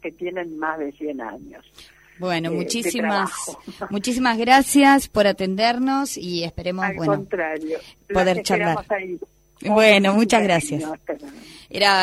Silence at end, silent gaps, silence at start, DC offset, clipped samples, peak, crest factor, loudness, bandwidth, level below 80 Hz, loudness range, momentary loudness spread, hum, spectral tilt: 0 s; none; 0.05 s; under 0.1%; under 0.1%; -2 dBFS; 18 dB; -20 LUFS; 15.5 kHz; -50 dBFS; 7 LU; 17 LU; none; -4 dB/octave